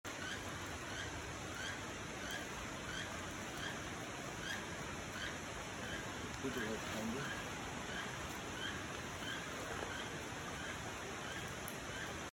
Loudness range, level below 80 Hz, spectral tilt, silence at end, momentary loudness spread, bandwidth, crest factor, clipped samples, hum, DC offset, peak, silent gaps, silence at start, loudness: 1 LU; -60 dBFS; -3 dB/octave; 0 s; 3 LU; 19 kHz; 18 dB; under 0.1%; none; under 0.1%; -26 dBFS; none; 0.05 s; -44 LUFS